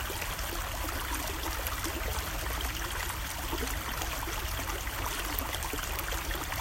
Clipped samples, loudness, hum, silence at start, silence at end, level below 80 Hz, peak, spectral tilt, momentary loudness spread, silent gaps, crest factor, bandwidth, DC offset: under 0.1%; -34 LUFS; none; 0 s; 0 s; -38 dBFS; -8 dBFS; -2.5 dB/octave; 1 LU; none; 26 dB; 16.5 kHz; under 0.1%